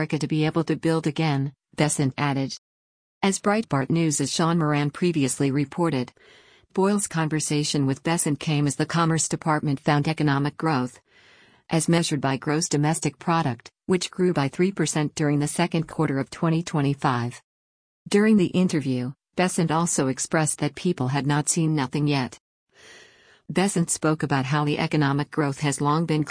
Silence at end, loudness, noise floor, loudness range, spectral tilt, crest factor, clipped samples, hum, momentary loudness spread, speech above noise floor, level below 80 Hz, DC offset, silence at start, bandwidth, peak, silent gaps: 0 s; -24 LUFS; -55 dBFS; 2 LU; -5 dB/octave; 16 dB; under 0.1%; none; 4 LU; 32 dB; -60 dBFS; under 0.1%; 0 s; 10.5 kHz; -6 dBFS; 2.58-3.21 s, 17.44-18.05 s, 22.40-22.67 s